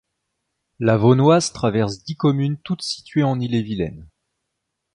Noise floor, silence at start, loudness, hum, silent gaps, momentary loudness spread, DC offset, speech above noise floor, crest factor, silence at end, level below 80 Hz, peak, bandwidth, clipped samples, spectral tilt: -78 dBFS; 0.8 s; -20 LUFS; none; none; 11 LU; under 0.1%; 59 dB; 18 dB; 0.9 s; -50 dBFS; -2 dBFS; 11 kHz; under 0.1%; -6.5 dB/octave